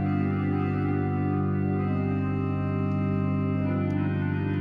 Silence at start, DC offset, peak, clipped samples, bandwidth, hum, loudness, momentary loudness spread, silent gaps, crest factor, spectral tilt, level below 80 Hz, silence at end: 0 s; under 0.1%; -14 dBFS; under 0.1%; 4.7 kHz; 50 Hz at -65 dBFS; -27 LUFS; 1 LU; none; 10 dB; -11 dB/octave; -56 dBFS; 0 s